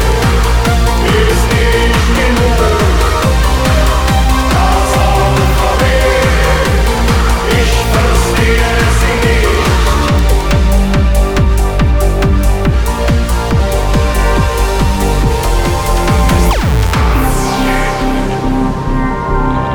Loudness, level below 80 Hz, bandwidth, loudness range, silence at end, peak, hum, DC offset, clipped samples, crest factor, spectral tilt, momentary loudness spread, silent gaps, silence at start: -12 LUFS; -12 dBFS; 18 kHz; 2 LU; 0 s; 0 dBFS; none; under 0.1%; under 0.1%; 10 dB; -5 dB/octave; 3 LU; none; 0 s